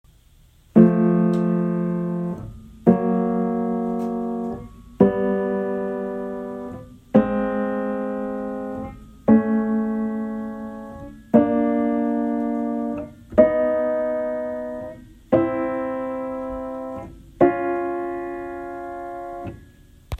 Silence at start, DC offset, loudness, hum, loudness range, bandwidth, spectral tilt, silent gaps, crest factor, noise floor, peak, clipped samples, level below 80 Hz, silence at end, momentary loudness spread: 0.75 s; under 0.1%; -22 LUFS; none; 5 LU; 4.1 kHz; -10 dB/octave; none; 22 dB; -53 dBFS; 0 dBFS; under 0.1%; -48 dBFS; 0.05 s; 16 LU